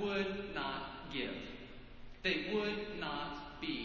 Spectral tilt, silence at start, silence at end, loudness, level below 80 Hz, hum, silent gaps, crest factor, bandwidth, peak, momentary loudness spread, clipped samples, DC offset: -5.5 dB/octave; 0 s; 0 s; -39 LUFS; -58 dBFS; none; none; 20 dB; 7.2 kHz; -20 dBFS; 15 LU; under 0.1%; under 0.1%